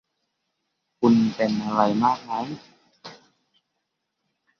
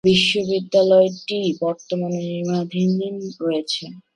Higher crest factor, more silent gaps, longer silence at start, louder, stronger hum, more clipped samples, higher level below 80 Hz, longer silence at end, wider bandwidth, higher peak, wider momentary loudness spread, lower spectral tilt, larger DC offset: first, 22 dB vs 16 dB; neither; first, 1 s vs 0.05 s; about the same, -22 LUFS vs -20 LUFS; neither; neither; second, -64 dBFS vs -58 dBFS; first, 1.45 s vs 0.15 s; second, 6.8 kHz vs 11 kHz; about the same, -4 dBFS vs -4 dBFS; first, 24 LU vs 10 LU; first, -7 dB/octave vs -5.5 dB/octave; neither